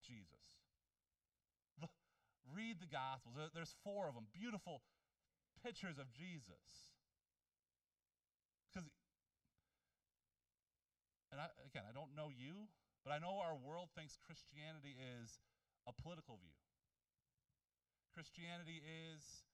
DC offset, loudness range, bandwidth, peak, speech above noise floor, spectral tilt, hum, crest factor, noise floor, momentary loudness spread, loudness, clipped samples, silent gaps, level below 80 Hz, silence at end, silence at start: under 0.1%; 13 LU; 12.5 kHz; -32 dBFS; over 36 dB; -5 dB/octave; none; 24 dB; under -90 dBFS; 14 LU; -54 LUFS; under 0.1%; none; -82 dBFS; 0.1 s; 0 s